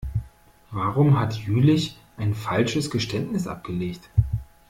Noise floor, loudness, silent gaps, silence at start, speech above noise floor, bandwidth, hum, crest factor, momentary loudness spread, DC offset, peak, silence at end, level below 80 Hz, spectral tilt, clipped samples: -50 dBFS; -24 LUFS; none; 0 s; 27 dB; 15.5 kHz; none; 18 dB; 11 LU; under 0.1%; -6 dBFS; 0.25 s; -40 dBFS; -6.5 dB/octave; under 0.1%